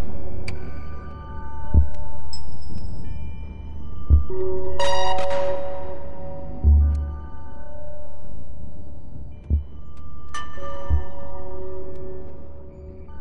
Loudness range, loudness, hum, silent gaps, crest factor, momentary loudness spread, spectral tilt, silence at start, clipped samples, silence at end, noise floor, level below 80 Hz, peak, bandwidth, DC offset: 9 LU; -27 LUFS; none; none; 14 dB; 20 LU; -6.5 dB/octave; 0 s; under 0.1%; 0 s; -38 dBFS; -28 dBFS; -4 dBFS; 10 kHz; under 0.1%